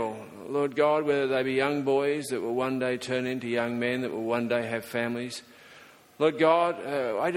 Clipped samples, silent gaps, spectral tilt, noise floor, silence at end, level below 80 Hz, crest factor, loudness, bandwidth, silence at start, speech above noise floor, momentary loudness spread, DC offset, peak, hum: under 0.1%; none; -5.5 dB/octave; -53 dBFS; 0 s; -70 dBFS; 18 dB; -27 LUFS; 16.5 kHz; 0 s; 26 dB; 8 LU; under 0.1%; -10 dBFS; none